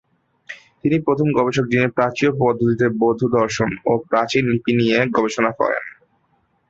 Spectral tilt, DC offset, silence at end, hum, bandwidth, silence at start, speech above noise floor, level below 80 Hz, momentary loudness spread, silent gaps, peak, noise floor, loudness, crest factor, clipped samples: -6 dB/octave; under 0.1%; 0.8 s; none; 8 kHz; 0.5 s; 46 dB; -54 dBFS; 5 LU; none; -2 dBFS; -64 dBFS; -18 LUFS; 16 dB; under 0.1%